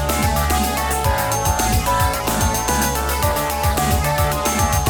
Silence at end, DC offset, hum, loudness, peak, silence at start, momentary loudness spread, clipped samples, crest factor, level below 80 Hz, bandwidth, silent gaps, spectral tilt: 0 s; under 0.1%; none; -18 LUFS; -4 dBFS; 0 s; 2 LU; under 0.1%; 14 dB; -26 dBFS; over 20 kHz; none; -4 dB/octave